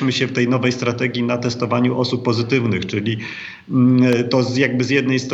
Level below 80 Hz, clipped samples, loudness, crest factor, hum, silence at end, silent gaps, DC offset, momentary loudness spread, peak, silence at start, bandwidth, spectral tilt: -62 dBFS; under 0.1%; -18 LUFS; 16 dB; none; 0 s; none; under 0.1%; 7 LU; -2 dBFS; 0 s; 8 kHz; -6 dB/octave